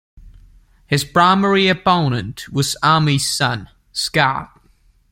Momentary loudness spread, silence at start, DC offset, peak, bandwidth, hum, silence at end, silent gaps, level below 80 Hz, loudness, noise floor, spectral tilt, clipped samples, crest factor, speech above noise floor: 11 LU; 0.25 s; under 0.1%; -2 dBFS; 16.5 kHz; none; 0.65 s; none; -48 dBFS; -17 LUFS; -54 dBFS; -4.5 dB/octave; under 0.1%; 18 dB; 38 dB